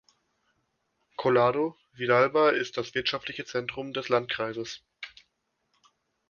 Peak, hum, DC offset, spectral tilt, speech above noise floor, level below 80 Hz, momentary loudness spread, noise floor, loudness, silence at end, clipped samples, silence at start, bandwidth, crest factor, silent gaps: -8 dBFS; none; under 0.1%; -5 dB/octave; 50 dB; -68 dBFS; 18 LU; -77 dBFS; -27 LUFS; 1.2 s; under 0.1%; 1.2 s; 7.2 kHz; 22 dB; none